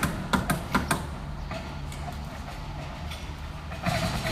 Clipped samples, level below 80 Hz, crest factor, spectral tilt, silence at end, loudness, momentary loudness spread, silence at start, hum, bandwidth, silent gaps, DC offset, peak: under 0.1%; -38 dBFS; 20 dB; -5 dB/octave; 0 s; -32 LUFS; 11 LU; 0 s; none; 15.5 kHz; none; under 0.1%; -10 dBFS